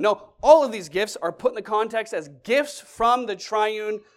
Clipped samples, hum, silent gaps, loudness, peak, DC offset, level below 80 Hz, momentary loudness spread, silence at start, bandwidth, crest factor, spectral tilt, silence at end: under 0.1%; none; none; -22 LUFS; -2 dBFS; under 0.1%; -56 dBFS; 12 LU; 0 s; 14 kHz; 20 dB; -3.5 dB/octave; 0.2 s